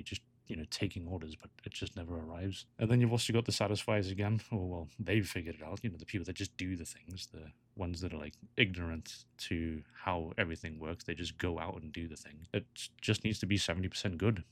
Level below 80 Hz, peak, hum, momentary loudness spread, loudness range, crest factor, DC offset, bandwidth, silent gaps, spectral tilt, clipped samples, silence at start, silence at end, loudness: -56 dBFS; -12 dBFS; none; 14 LU; 6 LU; 26 dB; under 0.1%; 15.5 kHz; none; -5 dB/octave; under 0.1%; 0 s; 0.1 s; -37 LUFS